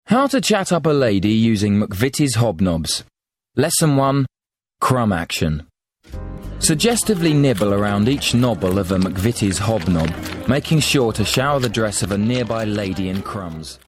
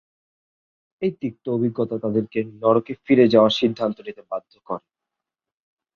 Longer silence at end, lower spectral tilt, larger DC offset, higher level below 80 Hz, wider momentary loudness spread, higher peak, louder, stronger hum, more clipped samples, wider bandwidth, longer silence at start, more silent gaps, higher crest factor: second, 0.15 s vs 1.15 s; second, -5 dB/octave vs -7 dB/octave; neither; first, -40 dBFS vs -64 dBFS; second, 8 LU vs 18 LU; about the same, -2 dBFS vs -2 dBFS; first, -18 LUFS vs -21 LUFS; neither; neither; first, 16 kHz vs 7 kHz; second, 0.1 s vs 1 s; neither; about the same, 16 dB vs 20 dB